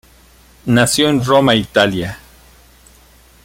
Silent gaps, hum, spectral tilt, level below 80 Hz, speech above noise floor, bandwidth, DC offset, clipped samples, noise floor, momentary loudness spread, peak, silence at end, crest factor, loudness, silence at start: none; none; -4.5 dB/octave; -44 dBFS; 33 dB; 16.5 kHz; under 0.1%; under 0.1%; -47 dBFS; 16 LU; 0 dBFS; 1.3 s; 16 dB; -13 LUFS; 0.65 s